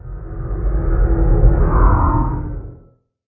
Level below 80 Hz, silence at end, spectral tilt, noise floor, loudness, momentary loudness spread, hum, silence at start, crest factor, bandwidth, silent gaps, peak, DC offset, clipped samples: -16 dBFS; 0.55 s; -15 dB/octave; -49 dBFS; -17 LUFS; 16 LU; none; 0.05 s; 16 dB; 2.3 kHz; none; 0 dBFS; under 0.1%; under 0.1%